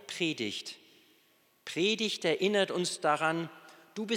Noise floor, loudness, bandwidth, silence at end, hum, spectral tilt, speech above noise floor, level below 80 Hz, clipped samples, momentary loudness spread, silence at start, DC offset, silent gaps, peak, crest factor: -68 dBFS; -31 LUFS; 17.5 kHz; 0 s; none; -3.5 dB/octave; 37 dB; under -90 dBFS; under 0.1%; 16 LU; 0 s; under 0.1%; none; -12 dBFS; 20 dB